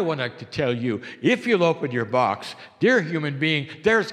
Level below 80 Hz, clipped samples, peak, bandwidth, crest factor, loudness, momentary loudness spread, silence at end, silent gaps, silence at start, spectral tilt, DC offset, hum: -62 dBFS; under 0.1%; -6 dBFS; 11.5 kHz; 18 dB; -23 LUFS; 8 LU; 0 s; none; 0 s; -6 dB/octave; under 0.1%; none